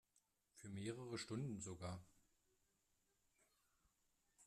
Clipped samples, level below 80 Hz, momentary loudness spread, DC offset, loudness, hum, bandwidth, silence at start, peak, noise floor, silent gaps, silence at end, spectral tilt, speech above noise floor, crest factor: under 0.1%; -80 dBFS; 9 LU; under 0.1%; -51 LUFS; none; 14 kHz; 0.55 s; -36 dBFS; -85 dBFS; none; 0 s; -5 dB/octave; 35 dB; 20 dB